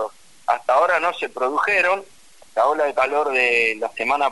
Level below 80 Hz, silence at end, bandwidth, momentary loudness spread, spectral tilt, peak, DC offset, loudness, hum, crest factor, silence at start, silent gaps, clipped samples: -64 dBFS; 0 s; 11.5 kHz; 8 LU; -2.5 dB/octave; -4 dBFS; 0.4%; -19 LUFS; none; 16 dB; 0 s; none; under 0.1%